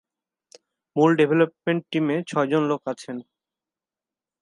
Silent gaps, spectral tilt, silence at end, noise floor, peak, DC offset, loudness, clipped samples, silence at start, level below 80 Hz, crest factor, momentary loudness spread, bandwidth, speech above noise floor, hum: none; -7 dB/octave; 1.2 s; under -90 dBFS; -6 dBFS; under 0.1%; -23 LUFS; under 0.1%; 0.95 s; -76 dBFS; 18 dB; 14 LU; 11 kHz; over 68 dB; none